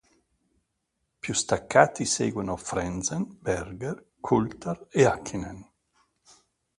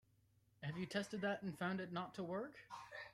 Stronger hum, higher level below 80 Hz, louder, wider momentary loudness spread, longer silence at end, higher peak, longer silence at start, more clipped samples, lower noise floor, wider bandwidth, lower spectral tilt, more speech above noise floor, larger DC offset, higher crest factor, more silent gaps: second, none vs 60 Hz at -75 dBFS; first, -52 dBFS vs -80 dBFS; first, -27 LUFS vs -46 LUFS; first, 14 LU vs 9 LU; first, 1.15 s vs 0 s; first, -2 dBFS vs -26 dBFS; first, 1.25 s vs 0.6 s; neither; about the same, -79 dBFS vs -76 dBFS; second, 11.5 kHz vs 14 kHz; second, -4.5 dB/octave vs -6 dB/octave; first, 52 dB vs 31 dB; neither; first, 26 dB vs 20 dB; neither